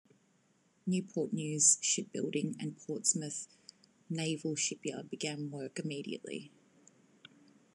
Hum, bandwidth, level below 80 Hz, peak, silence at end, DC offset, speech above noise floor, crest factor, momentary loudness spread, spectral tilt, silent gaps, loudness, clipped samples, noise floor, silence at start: none; 12.5 kHz; -88 dBFS; -14 dBFS; 1.25 s; under 0.1%; 36 dB; 24 dB; 16 LU; -3 dB/octave; none; -34 LUFS; under 0.1%; -72 dBFS; 0.85 s